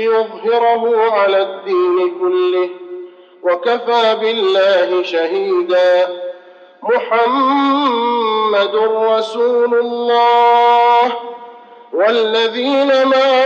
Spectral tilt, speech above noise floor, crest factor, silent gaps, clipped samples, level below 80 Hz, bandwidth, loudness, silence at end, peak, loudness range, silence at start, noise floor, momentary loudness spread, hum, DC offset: -4 dB/octave; 27 dB; 10 dB; none; under 0.1%; -88 dBFS; 7.6 kHz; -14 LUFS; 0 s; -2 dBFS; 3 LU; 0 s; -40 dBFS; 9 LU; none; under 0.1%